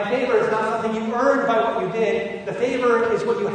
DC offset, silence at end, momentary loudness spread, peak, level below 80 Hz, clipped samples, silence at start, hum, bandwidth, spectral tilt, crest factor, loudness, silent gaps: under 0.1%; 0 s; 5 LU; -6 dBFS; -58 dBFS; under 0.1%; 0 s; none; 9.4 kHz; -5.5 dB/octave; 14 dB; -21 LUFS; none